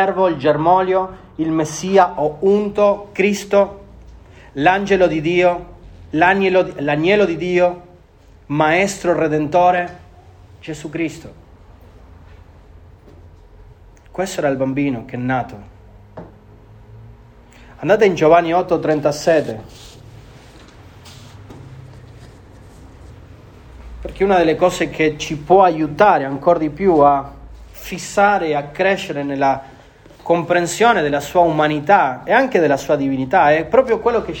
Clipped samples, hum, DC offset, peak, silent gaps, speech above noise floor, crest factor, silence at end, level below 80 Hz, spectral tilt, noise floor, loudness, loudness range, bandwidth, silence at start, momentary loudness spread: under 0.1%; none; under 0.1%; 0 dBFS; none; 30 dB; 18 dB; 0 s; -44 dBFS; -5.5 dB/octave; -46 dBFS; -16 LUFS; 10 LU; 19 kHz; 0 s; 13 LU